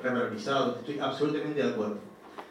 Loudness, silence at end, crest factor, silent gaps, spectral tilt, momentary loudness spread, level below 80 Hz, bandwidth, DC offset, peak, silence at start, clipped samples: -30 LUFS; 0 s; 16 dB; none; -5.5 dB/octave; 12 LU; -78 dBFS; 13.5 kHz; under 0.1%; -16 dBFS; 0 s; under 0.1%